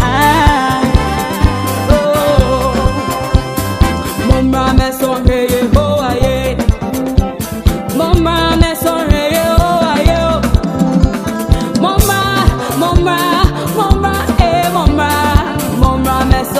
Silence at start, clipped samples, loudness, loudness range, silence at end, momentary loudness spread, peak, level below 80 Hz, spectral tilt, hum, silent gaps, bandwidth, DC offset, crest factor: 0 s; 0.2%; -12 LUFS; 1 LU; 0 s; 4 LU; 0 dBFS; -18 dBFS; -5.5 dB/octave; none; none; 16 kHz; 0.4%; 12 dB